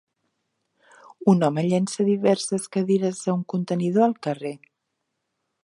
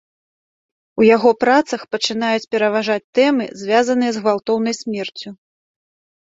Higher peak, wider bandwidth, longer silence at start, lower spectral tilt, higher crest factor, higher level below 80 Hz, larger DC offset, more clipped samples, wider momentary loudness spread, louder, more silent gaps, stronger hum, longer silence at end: about the same, -4 dBFS vs -2 dBFS; first, 11.5 kHz vs 7.8 kHz; first, 1.2 s vs 0.95 s; first, -6.5 dB/octave vs -4 dB/octave; about the same, 20 dB vs 16 dB; second, -72 dBFS vs -64 dBFS; neither; neither; second, 9 LU vs 12 LU; second, -23 LUFS vs -17 LUFS; second, none vs 3.04-3.13 s; neither; first, 1.1 s vs 0.85 s